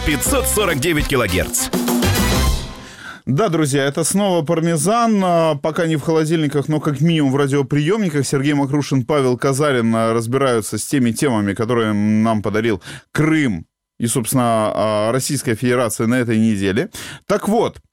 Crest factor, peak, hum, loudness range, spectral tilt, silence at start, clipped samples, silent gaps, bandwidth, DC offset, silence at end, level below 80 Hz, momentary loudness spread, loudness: 12 dB; -6 dBFS; none; 1 LU; -5 dB/octave; 0 s; under 0.1%; none; 17 kHz; under 0.1%; 0.15 s; -34 dBFS; 5 LU; -17 LUFS